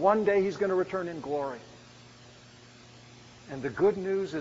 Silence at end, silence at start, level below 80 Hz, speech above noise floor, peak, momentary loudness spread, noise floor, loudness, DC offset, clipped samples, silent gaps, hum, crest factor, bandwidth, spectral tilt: 0 s; 0 s; -64 dBFS; 25 dB; -10 dBFS; 25 LU; -53 dBFS; -29 LUFS; under 0.1%; under 0.1%; none; none; 20 dB; 7.6 kHz; -5.5 dB/octave